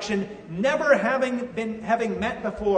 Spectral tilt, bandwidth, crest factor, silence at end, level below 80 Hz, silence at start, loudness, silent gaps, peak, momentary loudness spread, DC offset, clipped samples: -5.5 dB/octave; 9.6 kHz; 18 dB; 0 s; -52 dBFS; 0 s; -25 LUFS; none; -6 dBFS; 9 LU; under 0.1%; under 0.1%